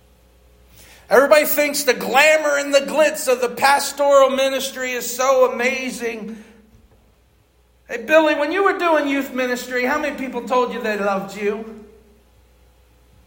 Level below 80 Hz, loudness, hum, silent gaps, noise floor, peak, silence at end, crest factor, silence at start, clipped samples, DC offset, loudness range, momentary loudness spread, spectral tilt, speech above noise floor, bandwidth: -56 dBFS; -17 LUFS; none; none; -56 dBFS; 0 dBFS; 1.4 s; 18 dB; 1.1 s; under 0.1%; under 0.1%; 7 LU; 11 LU; -2.5 dB/octave; 39 dB; 16.5 kHz